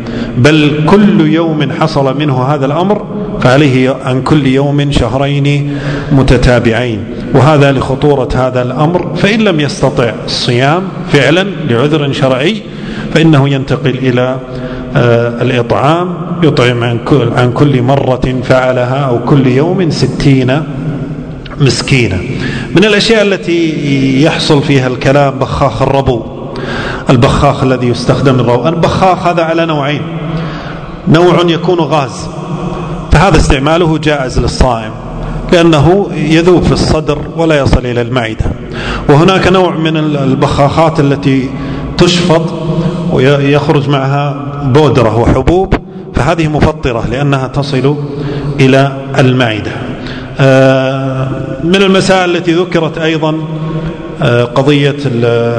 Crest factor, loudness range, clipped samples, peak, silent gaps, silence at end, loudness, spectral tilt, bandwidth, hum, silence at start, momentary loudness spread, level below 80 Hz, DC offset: 10 dB; 2 LU; 3%; 0 dBFS; none; 0 s; -10 LUFS; -6.5 dB/octave; 11 kHz; none; 0 s; 10 LU; -26 dBFS; under 0.1%